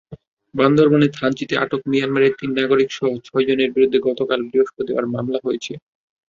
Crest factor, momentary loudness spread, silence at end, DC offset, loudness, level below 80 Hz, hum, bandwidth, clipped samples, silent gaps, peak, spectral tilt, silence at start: 16 dB; 8 LU; 0.5 s; under 0.1%; -19 LUFS; -60 dBFS; none; 7.4 kHz; under 0.1%; 0.27-0.37 s; -2 dBFS; -6.5 dB/octave; 0.1 s